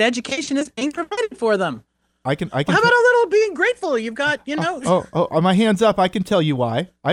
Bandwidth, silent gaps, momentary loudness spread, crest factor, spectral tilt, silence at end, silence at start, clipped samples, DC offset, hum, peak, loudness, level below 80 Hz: 14 kHz; none; 10 LU; 16 dB; -5 dB/octave; 0 s; 0 s; under 0.1%; under 0.1%; none; -4 dBFS; -19 LUFS; -56 dBFS